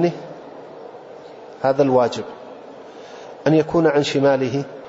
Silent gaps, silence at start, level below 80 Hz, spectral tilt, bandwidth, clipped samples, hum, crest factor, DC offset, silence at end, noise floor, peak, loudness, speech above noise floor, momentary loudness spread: none; 0 s; -60 dBFS; -6.5 dB/octave; 8 kHz; under 0.1%; none; 16 dB; under 0.1%; 0 s; -39 dBFS; -4 dBFS; -19 LUFS; 21 dB; 22 LU